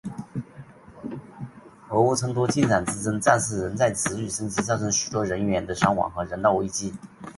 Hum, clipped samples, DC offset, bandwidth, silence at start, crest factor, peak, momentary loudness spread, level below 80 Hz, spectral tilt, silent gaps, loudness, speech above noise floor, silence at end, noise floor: none; under 0.1%; under 0.1%; 12 kHz; 0.05 s; 24 dB; -2 dBFS; 16 LU; -50 dBFS; -4.5 dB/octave; none; -24 LUFS; 22 dB; 0.05 s; -46 dBFS